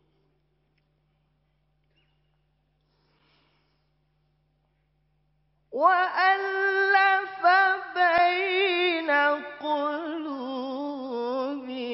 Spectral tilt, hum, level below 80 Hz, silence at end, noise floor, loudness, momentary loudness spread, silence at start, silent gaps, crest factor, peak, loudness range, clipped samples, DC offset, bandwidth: 1.5 dB/octave; none; -72 dBFS; 0 s; -71 dBFS; -24 LUFS; 12 LU; 5.7 s; none; 20 dB; -8 dBFS; 6 LU; under 0.1%; under 0.1%; 5.8 kHz